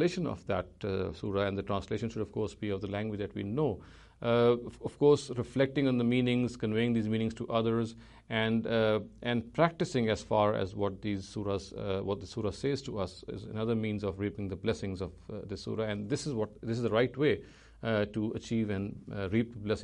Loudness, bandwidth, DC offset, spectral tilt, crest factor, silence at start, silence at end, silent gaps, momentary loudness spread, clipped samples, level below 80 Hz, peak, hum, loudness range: -32 LUFS; 10.5 kHz; under 0.1%; -6.5 dB/octave; 18 dB; 0 s; 0 s; none; 9 LU; under 0.1%; -56 dBFS; -14 dBFS; none; 6 LU